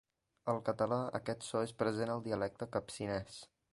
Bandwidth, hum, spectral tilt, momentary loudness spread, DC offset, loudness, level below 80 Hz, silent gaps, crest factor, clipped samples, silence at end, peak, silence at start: 11.5 kHz; none; -5.5 dB/octave; 6 LU; under 0.1%; -38 LUFS; -66 dBFS; none; 20 dB; under 0.1%; 0.3 s; -18 dBFS; 0.45 s